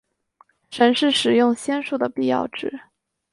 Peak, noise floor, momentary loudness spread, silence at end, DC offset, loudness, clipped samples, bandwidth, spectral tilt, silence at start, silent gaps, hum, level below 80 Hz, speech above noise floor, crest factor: -4 dBFS; -59 dBFS; 14 LU; 0.5 s; under 0.1%; -20 LUFS; under 0.1%; 11.5 kHz; -3.5 dB/octave; 0.7 s; none; none; -66 dBFS; 39 dB; 18 dB